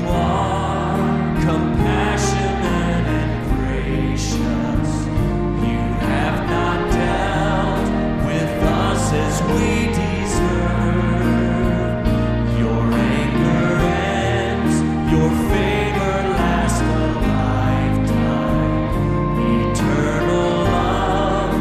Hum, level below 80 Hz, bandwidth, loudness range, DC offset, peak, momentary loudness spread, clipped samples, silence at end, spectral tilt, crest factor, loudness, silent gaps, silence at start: none; -26 dBFS; 15 kHz; 2 LU; under 0.1%; -4 dBFS; 3 LU; under 0.1%; 0 s; -6.5 dB/octave; 14 dB; -19 LUFS; none; 0 s